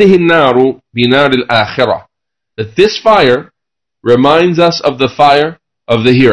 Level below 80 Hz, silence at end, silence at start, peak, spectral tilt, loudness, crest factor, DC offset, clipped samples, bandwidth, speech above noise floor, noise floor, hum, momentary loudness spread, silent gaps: -44 dBFS; 0 s; 0 s; 0 dBFS; -6 dB/octave; -10 LUFS; 10 dB; under 0.1%; 2%; 11 kHz; 72 dB; -81 dBFS; none; 8 LU; none